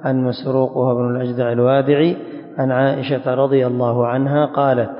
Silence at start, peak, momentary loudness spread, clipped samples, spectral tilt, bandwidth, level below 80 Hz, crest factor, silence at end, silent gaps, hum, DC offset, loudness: 0 s; -2 dBFS; 5 LU; under 0.1%; -12.5 dB/octave; 5.4 kHz; -62 dBFS; 14 dB; 0 s; none; none; under 0.1%; -17 LUFS